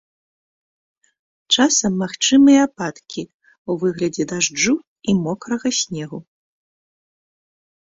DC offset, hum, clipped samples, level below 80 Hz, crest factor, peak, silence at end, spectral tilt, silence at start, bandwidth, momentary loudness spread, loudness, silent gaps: under 0.1%; none; under 0.1%; -58 dBFS; 18 dB; -2 dBFS; 1.7 s; -3.5 dB/octave; 1.5 s; 7.8 kHz; 18 LU; -18 LUFS; 3.34-3.40 s, 3.58-3.65 s, 4.87-4.96 s